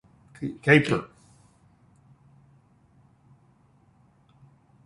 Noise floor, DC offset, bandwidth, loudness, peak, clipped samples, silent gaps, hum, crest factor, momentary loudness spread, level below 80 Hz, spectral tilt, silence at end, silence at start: -61 dBFS; under 0.1%; 11.5 kHz; -23 LUFS; -2 dBFS; under 0.1%; none; none; 28 dB; 19 LU; -62 dBFS; -6.5 dB/octave; 3.8 s; 0.4 s